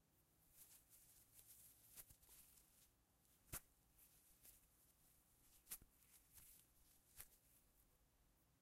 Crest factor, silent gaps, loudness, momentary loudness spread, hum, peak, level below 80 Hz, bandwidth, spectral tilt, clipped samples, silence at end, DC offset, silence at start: 34 dB; none; -63 LUFS; 12 LU; none; -34 dBFS; -78 dBFS; 16 kHz; -1.5 dB/octave; under 0.1%; 0 s; under 0.1%; 0 s